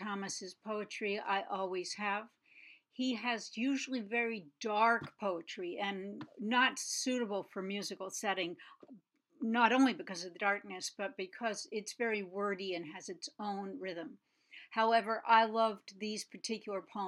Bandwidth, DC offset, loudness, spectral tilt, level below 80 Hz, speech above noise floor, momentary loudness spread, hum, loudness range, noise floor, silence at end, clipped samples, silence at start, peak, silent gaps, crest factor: 13.5 kHz; under 0.1%; -36 LUFS; -3 dB/octave; under -90 dBFS; 25 dB; 13 LU; none; 5 LU; -61 dBFS; 0 s; under 0.1%; 0 s; -12 dBFS; none; 24 dB